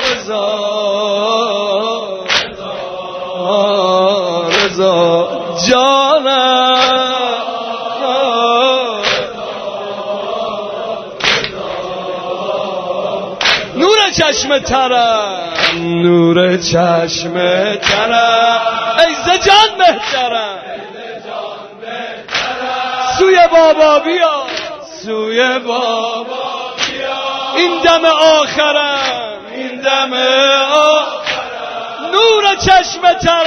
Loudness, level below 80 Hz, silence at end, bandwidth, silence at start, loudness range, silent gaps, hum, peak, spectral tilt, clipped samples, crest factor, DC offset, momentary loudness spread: -12 LUFS; -46 dBFS; 0 s; 11 kHz; 0 s; 5 LU; none; none; 0 dBFS; -3 dB/octave; under 0.1%; 12 dB; under 0.1%; 13 LU